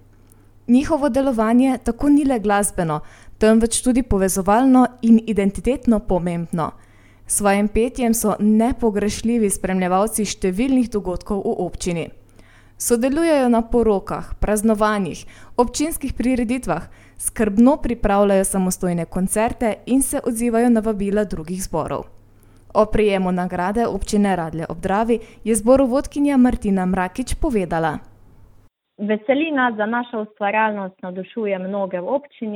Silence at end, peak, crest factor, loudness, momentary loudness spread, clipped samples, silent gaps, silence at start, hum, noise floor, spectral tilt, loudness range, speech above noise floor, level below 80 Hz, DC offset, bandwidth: 0 s; -2 dBFS; 18 dB; -19 LUFS; 9 LU; under 0.1%; none; 0.7 s; none; -51 dBFS; -5.5 dB/octave; 5 LU; 33 dB; -36 dBFS; under 0.1%; 17 kHz